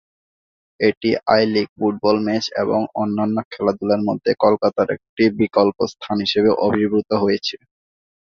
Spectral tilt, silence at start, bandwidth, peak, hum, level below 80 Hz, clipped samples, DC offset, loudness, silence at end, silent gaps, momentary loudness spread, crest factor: -6 dB/octave; 0.8 s; 7.2 kHz; -2 dBFS; none; -56 dBFS; under 0.1%; under 0.1%; -19 LUFS; 0.75 s; 0.97-1.01 s, 1.69-1.76 s, 3.45-3.51 s, 5.09-5.17 s; 6 LU; 18 dB